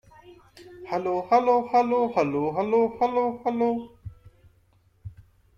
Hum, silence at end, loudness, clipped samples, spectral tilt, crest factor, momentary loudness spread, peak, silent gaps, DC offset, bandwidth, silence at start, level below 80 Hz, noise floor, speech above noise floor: none; 0.45 s; -24 LUFS; under 0.1%; -7.5 dB/octave; 18 dB; 24 LU; -8 dBFS; none; under 0.1%; 7.2 kHz; 0.3 s; -58 dBFS; -62 dBFS; 39 dB